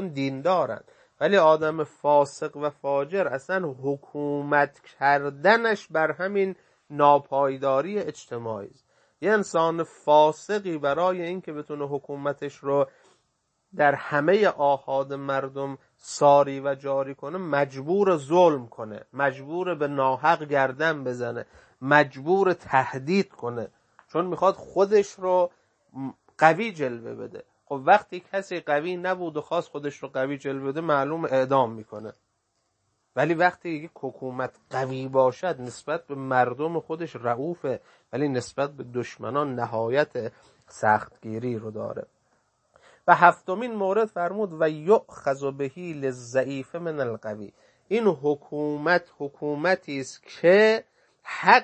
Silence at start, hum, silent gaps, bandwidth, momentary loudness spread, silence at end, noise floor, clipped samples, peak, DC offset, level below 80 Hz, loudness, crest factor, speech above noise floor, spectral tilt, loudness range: 0 s; none; none; 8.8 kHz; 15 LU; 0 s; -74 dBFS; under 0.1%; 0 dBFS; under 0.1%; -72 dBFS; -25 LUFS; 24 dB; 49 dB; -6 dB/octave; 5 LU